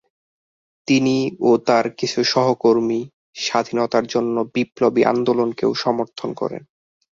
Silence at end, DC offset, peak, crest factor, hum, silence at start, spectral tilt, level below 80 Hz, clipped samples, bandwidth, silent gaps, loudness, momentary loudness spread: 0.6 s; under 0.1%; -2 dBFS; 18 dB; none; 0.9 s; -5 dB/octave; -62 dBFS; under 0.1%; 7.6 kHz; 3.13-3.33 s; -19 LUFS; 10 LU